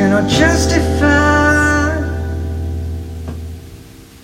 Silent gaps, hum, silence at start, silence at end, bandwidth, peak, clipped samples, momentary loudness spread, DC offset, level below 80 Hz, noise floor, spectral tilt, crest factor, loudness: none; none; 0 s; 0.05 s; 15.5 kHz; 0 dBFS; under 0.1%; 16 LU; under 0.1%; -24 dBFS; -37 dBFS; -5 dB/octave; 14 dB; -14 LUFS